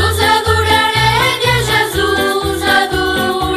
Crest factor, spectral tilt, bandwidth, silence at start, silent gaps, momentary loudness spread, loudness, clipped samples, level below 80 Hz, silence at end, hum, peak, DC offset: 12 dB; -3.5 dB/octave; 14 kHz; 0 s; none; 4 LU; -12 LUFS; under 0.1%; -30 dBFS; 0 s; none; -2 dBFS; 0.1%